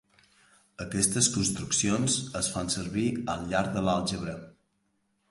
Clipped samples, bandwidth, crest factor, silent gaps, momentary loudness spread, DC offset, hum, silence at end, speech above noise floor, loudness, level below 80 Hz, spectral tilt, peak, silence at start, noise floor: under 0.1%; 11.5 kHz; 20 dB; none; 11 LU; under 0.1%; none; 0.8 s; 45 dB; -28 LUFS; -52 dBFS; -3.5 dB/octave; -10 dBFS; 0.8 s; -74 dBFS